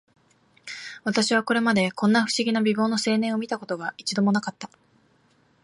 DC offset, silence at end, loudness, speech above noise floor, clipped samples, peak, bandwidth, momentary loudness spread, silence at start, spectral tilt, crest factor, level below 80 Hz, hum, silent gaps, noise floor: under 0.1%; 1 s; -23 LUFS; 39 dB; under 0.1%; -8 dBFS; 11.5 kHz; 16 LU; 0.65 s; -4.5 dB/octave; 16 dB; -70 dBFS; none; none; -62 dBFS